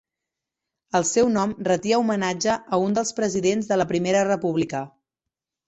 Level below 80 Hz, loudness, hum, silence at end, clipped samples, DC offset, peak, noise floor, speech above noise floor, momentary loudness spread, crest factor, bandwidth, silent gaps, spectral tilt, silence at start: -60 dBFS; -22 LUFS; none; 0.8 s; under 0.1%; under 0.1%; -6 dBFS; -86 dBFS; 65 dB; 5 LU; 16 dB; 8.4 kHz; none; -4.5 dB/octave; 0.95 s